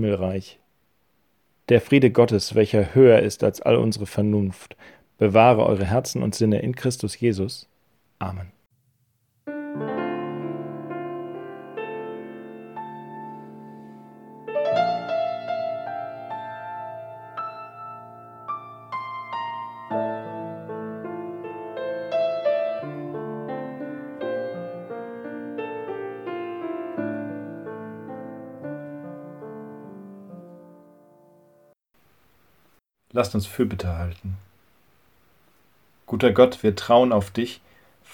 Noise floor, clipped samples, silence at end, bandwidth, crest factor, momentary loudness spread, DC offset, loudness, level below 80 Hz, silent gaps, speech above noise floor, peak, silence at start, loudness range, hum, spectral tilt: -68 dBFS; under 0.1%; 0 s; 18.5 kHz; 24 dB; 21 LU; under 0.1%; -24 LUFS; -54 dBFS; none; 48 dB; -2 dBFS; 0 s; 16 LU; none; -6.5 dB/octave